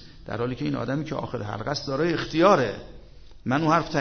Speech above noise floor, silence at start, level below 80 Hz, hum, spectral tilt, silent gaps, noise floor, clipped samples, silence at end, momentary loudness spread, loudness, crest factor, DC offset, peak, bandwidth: 20 dB; 0 s; -48 dBFS; none; -6 dB/octave; none; -44 dBFS; under 0.1%; 0 s; 12 LU; -25 LUFS; 20 dB; under 0.1%; -4 dBFS; 6.6 kHz